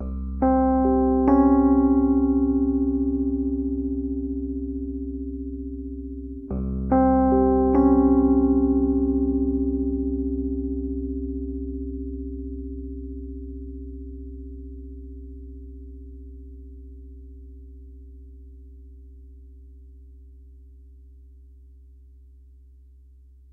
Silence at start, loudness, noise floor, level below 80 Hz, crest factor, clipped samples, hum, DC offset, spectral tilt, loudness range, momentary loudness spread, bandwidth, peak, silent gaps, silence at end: 0 s; -23 LUFS; -50 dBFS; -34 dBFS; 18 dB; under 0.1%; none; under 0.1%; -13.5 dB/octave; 23 LU; 24 LU; 2.2 kHz; -6 dBFS; none; 2.25 s